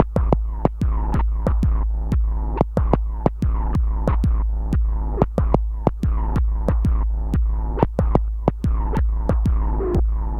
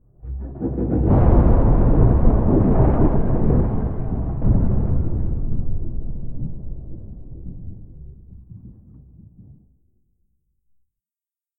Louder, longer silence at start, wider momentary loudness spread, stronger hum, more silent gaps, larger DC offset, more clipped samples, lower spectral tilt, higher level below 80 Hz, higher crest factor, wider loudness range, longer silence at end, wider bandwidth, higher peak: about the same, -22 LUFS vs -20 LUFS; second, 0 s vs 0.25 s; second, 3 LU vs 21 LU; neither; neither; neither; neither; second, -10 dB/octave vs -14.5 dB/octave; about the same, -20 dBFS vs -22 dBFS; about the same, 18 dB vs 18 dB; second, 0 LU vs 22 LU; second, 0 s vs 2.9 s; first, 3.4 kHz vs 2.6 kHz; about the same, 0 dBFS vs -2 dBFS